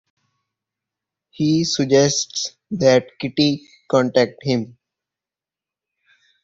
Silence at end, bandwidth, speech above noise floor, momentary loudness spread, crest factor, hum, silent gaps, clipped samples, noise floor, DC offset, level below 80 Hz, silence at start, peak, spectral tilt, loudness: 1.8 s; 7.8 kHz; 71 dB; 10 LU; 20 dB; none; none; under 0.1%; -89 dBFS; under 0.1%; -60 dBFS; 1.4 s; -2 dBFS; -4.5 dB/octave; -19 LUFS